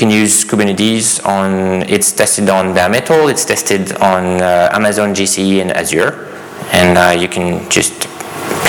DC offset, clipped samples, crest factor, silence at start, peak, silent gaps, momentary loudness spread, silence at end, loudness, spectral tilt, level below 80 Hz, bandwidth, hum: under 0.1%; under 0.1%; 12 dB; 0 s; 0 dBFS; none; 7 LU; 0 s; -11 LUFS; -3.5 dB/octave; -46 dBFS; over 20 kHz; none